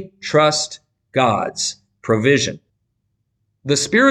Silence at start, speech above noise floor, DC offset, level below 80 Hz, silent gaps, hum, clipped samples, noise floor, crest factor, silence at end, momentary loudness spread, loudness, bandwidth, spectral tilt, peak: 0 s; 53 dB; under 0.1%; -58 dBFS; none; none; under 0.1%; -70 dBFS; 16 dB; 0 s; 12 LU; -18 LUFS; 13 kHz; -3.5 dB/octave; -4 dBFS